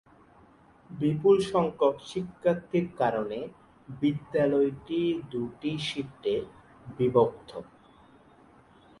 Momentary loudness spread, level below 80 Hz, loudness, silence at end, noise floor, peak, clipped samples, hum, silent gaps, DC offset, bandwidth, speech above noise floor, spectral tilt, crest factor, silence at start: 19 LU; -62 dBFS; -28 LUFS; 1.35 s; -57 dBFS; -10 dBFS; under 0.1%; none; none; under 0.1%; 11.5 kHz; 30 dB; -7 dB/octave; 20 dB; 0.9 s